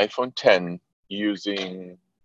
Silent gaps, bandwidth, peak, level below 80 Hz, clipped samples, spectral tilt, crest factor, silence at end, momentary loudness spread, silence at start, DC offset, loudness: 0.93-1.03 s; 7.8 kHz; -2 dBFS; -70 dBFS; under 0.1%; -5 dB/octave; 22 dB; 0.3 s; 20 LU; 0 s; under 0.1%; -24 LUFS